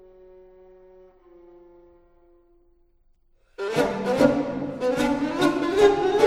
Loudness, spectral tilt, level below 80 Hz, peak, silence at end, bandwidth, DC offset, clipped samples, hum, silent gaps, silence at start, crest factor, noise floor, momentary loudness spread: -23 LUFS; -5.5 dB/octave; -52 dBFS; -4 dBFS; 0 s; 15.5 kHz; under 0.1%; under 0.1%; none; none; 3.6 s; 20 dB; -61 dBFS; 9 LU